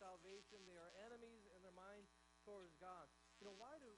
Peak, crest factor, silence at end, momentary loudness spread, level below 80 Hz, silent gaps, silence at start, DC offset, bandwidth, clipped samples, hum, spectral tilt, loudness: -44 dBFS; 18 dB; 0 s; 6 LU; -82 dBFS; none; 0 s; under 0.1%; 10.5 kHz; under 0.1%; none; -3.5 dB/octave; -63 LUFS